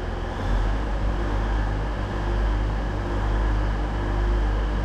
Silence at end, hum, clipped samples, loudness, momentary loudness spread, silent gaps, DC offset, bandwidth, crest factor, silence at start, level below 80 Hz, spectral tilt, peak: 0 s; none; under 0.1%; -27 LUFS; 3 LU; none; under 0.1%; 7.6 kHz; 12 dB; 0 s; -24 dBFS; -7 dB/octave; -12 dBFS